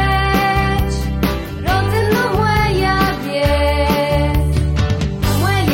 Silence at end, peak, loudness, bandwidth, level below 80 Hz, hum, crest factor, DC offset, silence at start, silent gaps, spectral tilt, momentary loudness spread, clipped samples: 0 s; -2 dBFS; -16 LUFS; 16.5 kHz; -22 dBFS; none; 12 dB; under 0.1%; 0 s; none; -6 dB/octave; 4 LU; under 0.1%